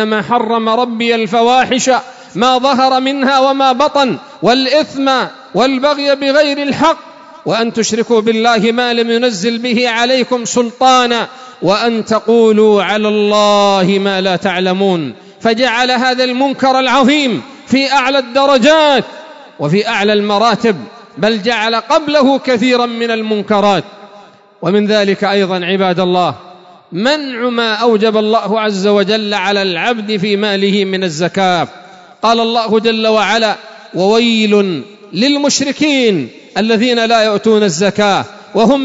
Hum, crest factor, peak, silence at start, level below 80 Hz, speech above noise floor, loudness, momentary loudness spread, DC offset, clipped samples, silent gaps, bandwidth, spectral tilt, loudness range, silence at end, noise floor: none; 12 dB; 0 dBFS; 0 s; -56 dBFS; 28 dB; -12 LUFS; 7 LU; under 0.1%; under 0.1%; none; 8 kHz; -4 dB/octave; 3 LU; 0 s; -40 dBFS